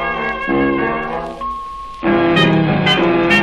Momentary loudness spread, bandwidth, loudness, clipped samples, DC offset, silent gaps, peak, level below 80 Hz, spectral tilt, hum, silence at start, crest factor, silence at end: 12 LU; 10.5 kHz; -15 LUFS; under 0.1%; under 0.1%; none; 0 dBFS; -38 dBFS; -6.5 dB/octave; none; 0 s; 14 dB; 0 s